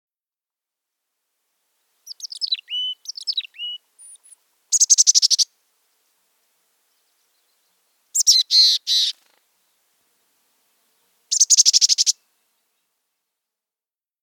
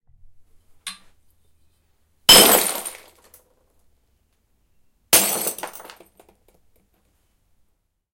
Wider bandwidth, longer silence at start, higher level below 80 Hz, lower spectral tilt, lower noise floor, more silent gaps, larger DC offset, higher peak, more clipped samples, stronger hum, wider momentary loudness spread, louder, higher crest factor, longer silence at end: first, over 20 kHz vs 17 kHz; first, 2.05 s vs 0.85 s; second, under -90 dBFS vs -52 dBFS; second, 9.5 dB/octave vs -0.5 dB/octave; first, under -90 dBFS vs -69 dBFS; neither; neither; about the same, 0 dBFS vs 0 dBFS; neither; neither; second, 18 LU vs 27 LU; about the same, -15 LUFS vs -14 LUFS; about the same, 22 dB vs 24 dB; second, 2.1 s vs 2.45 s